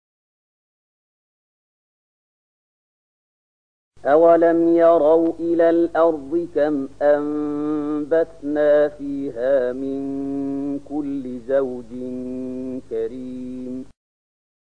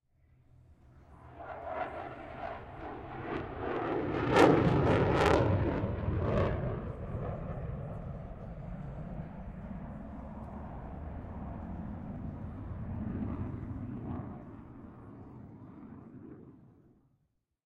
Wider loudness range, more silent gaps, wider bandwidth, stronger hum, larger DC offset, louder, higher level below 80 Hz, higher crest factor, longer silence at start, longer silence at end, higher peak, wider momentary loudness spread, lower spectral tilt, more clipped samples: second, 10 LU vs 16 LU; neither; second, 6.6 kHz vs 12.5 kHz; first, 50 Hz at -55 dBFS vs none; first, 0.7% vs under 0.1%; first, -20 LUFS vs -34 LUFS; second, -58 dBFS vs -46 dBFS; second, 16 dB vs 28 dB; first, 3.9 s vs 0.7 s; second, 0.75 s vs 0.95 s; about the same, -4 dBFS vs -6 dBFS; second, 15 LU vs 23 LU; about the same, -8 dB/octave vs -7.5 dB/octave; neither